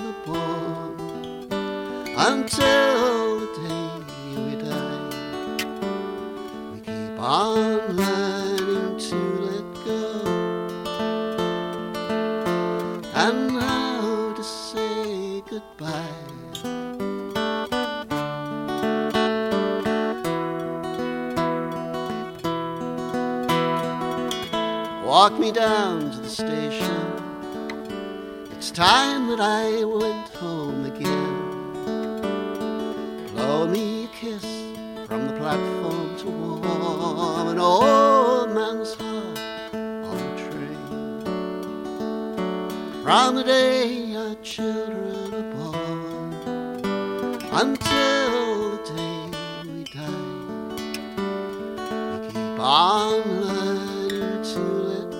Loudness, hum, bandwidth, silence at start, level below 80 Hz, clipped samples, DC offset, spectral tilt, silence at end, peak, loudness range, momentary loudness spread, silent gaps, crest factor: -24 LUFS; none; 17 kHz; 0 s; -56 dBFS; under 0.1%; under 0.1%; -4.5 dB/octave; 0 s; 0 dBFS; 7 LU; 13 LU; none; 24 dB